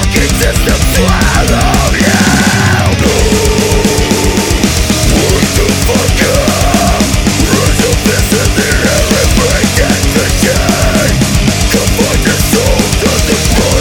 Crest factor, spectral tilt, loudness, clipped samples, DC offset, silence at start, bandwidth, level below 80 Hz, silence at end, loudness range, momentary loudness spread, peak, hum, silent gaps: 8 dB; -4 dB/octave; -9 LUFS; 0.9%; under 0.1%; 0 s; over 20 kHz; -16 dBFS; 0 s; 1 LU; 1 LU; 0 dBFS; none; none